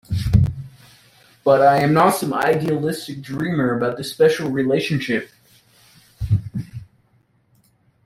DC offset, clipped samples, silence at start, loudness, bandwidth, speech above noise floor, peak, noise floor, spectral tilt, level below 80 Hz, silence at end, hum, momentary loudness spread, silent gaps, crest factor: under 0.1%; under 0.1%; 0.1 s; -19 LUFS; 16 kHz; 43 dB; 0 dBFS; -61 dBFS; -6.5 dB/octave; -40 dBFS; 1.2 s; none; 17 LU; none; 20 dB